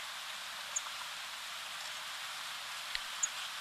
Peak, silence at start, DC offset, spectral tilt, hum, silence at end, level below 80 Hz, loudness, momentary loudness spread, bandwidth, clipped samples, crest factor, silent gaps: -16 dBFS; 0 s; under 0.1%; 2.5 dB/octave; none; 0 s; -72 dBFS; -39 LUFS; 6 LU; 14 kHz; under 0.1%; 26 dB; none